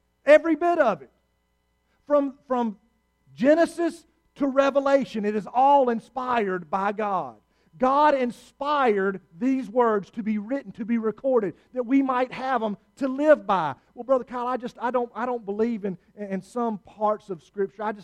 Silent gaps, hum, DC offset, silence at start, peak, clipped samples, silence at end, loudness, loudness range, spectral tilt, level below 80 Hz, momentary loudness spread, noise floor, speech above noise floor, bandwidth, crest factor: none; none; under 0.1%; 0.25 s; -4 dBFS; under 0.1%; 0 s; -24 LUFS; 4 LU; -6.5 dB/octave; -64 dBFS; 12 LU; -71 dBFS; 47 dB; 11.5 kHz; 20 dB